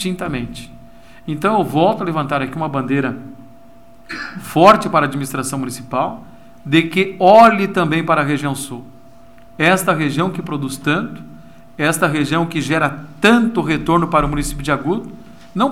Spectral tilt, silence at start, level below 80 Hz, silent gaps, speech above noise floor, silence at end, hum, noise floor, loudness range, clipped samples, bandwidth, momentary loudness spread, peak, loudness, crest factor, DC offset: -5.5 dB/octave; 0 s; -40 dBFS; none; 29 dB; 0 s; none; -45 dBFS; 5 LU; under 0.1%; 16.5 kHz; 17 LU; 0 dBFS; -16 LUFS; 18 dB; 0.9%